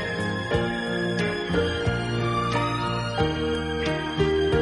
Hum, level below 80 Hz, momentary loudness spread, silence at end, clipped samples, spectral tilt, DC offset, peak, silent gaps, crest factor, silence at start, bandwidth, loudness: none; -40 dBFS; 3 LU; 0 s; under 0.1%; -6 dB/octave; under 0.1%; -10 dBFS; none; 16 dB; 0 s; 11.5 kHz; -25 LUFS